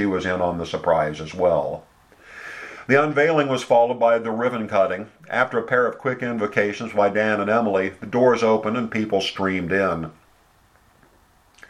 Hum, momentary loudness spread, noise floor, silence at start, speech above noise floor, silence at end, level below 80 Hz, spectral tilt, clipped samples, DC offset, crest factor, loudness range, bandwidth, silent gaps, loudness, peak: none; 9 LU; -57 dBFS; 0 s; 36 dB; 1.6 s; -56 dBFS; -6 dB/octave; under 0.1%; under 0.1%; 20 dB; 2 LU; 11.5 kHz; none; -21 LUFS; -2 dBFS